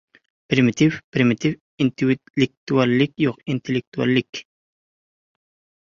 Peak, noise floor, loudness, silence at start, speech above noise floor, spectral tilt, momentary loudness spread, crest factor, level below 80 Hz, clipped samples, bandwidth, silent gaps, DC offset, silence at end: -2 dBFS; under -90 dBFS; -21 LUFS; 0.5 s; over 70 dB; -6.5 dB/octave; 7 LU; 20 dB; -58 dBFS; under 0.1%; 7.2 kHz; 1.04-1.12 s, 1.61-1.78 s, 2.30-2.34 s, 2.57-2.67 s, 3.87-3.92 s, 4.29-4.33 s; under 0.1%; 1.5 s